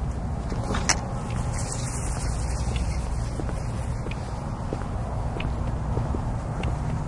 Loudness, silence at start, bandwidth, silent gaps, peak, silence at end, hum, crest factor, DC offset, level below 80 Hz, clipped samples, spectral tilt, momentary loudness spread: -29 LUFS; 0 s; 11.5 kHz; none; -4 dBFS; 0 s; none; 24 dB; under 0.1%; -32 dBFS; under 0.1%; -5 dB/octave; 5 LU